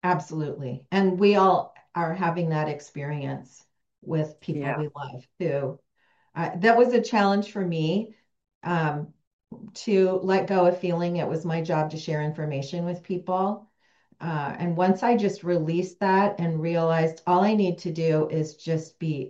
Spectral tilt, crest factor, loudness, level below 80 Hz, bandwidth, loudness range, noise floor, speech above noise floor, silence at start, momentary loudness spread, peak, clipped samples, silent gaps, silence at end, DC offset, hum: -7 dB/octave; 18 dB; -25 LUFS; -70 dBFS; 7.8 kHz; 6 LU; -65 dBFS; 40 dB; 0.05 s; 13 LU; -6 dBFS; under 0.1%; 8.55-8.61 s, 9.27-9.39 s; 0 s; under 0.1%; none